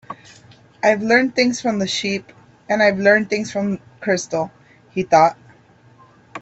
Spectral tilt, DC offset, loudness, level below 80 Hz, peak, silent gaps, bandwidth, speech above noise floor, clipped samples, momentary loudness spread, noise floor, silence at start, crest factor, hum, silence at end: -4.5 dB/octave; under 0.1%; -18 LUFS; -60 dBFS; 0 dBFS; none; 8.2 kHz; 33 dB; under 0.1%; 13 LU; -50 dBFS; 0.1 s; 18 dB; none; 0 s